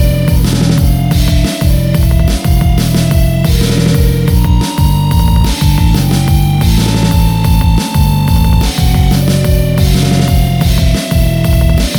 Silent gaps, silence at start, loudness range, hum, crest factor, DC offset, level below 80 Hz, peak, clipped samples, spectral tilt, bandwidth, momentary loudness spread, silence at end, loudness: none; 0 s; 0 LU; none; 8 dB; under 0.1%; -14 dBFS; 0 dBFS; under 0.1%; -6 dB/octave; over 20 kHz; 1 LU; 0 s; -11 LUFS